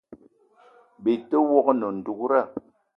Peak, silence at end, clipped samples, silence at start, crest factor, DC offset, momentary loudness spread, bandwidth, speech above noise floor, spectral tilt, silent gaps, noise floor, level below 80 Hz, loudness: -4 dBFS; 0.4 s; under 0.1%; 0.1 s; 20 dB; under 0.1%; 11 LU; 5.6 kHz; 35 dB; -9 dB/octave; none; -57 dBFS; -72 dBFS; -23 LUFS